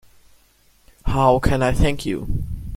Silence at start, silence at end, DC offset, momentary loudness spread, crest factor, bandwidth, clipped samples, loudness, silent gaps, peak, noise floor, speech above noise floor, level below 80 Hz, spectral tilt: 1.05 s; 0 s; under 0.1%; 12 LU; 18 dB; 16 kHz; under 0.1%; -20 LUFS; none; -2 dBFS; -57 dBFS; 39 dB; -28 dBFS; -6.5 dB/octave